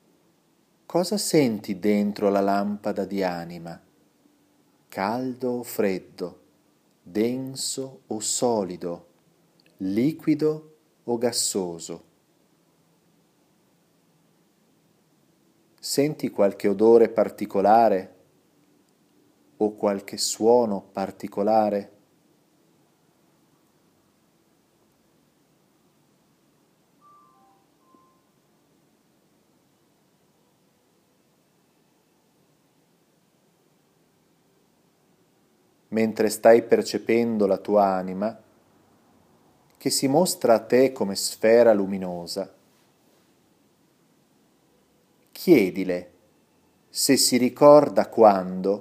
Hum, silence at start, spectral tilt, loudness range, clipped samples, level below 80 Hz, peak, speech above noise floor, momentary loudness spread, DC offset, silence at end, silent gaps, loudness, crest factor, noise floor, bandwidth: none; 0.9 s; -4.5 dB/octave; 9 LU; under 0.1%; -74 dBFS; -2 dBFS; 43 dB; 16 LU; under 0.1%; 0 s; none; -22 LUFS; 24 dB; -64 dBFS; 15.5 kHz